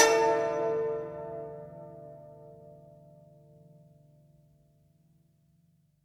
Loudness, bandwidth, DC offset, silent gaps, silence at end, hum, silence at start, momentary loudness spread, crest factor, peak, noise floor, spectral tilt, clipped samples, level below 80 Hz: -30 LUFS; 14.5 kHz; under 0.1%; none; 3.3 s; none; 0 s; 26 LU; 26 dB; -6 dBFS; -68 dBFS; -2.5 dB/octave; under 0.1%; -70 dBFS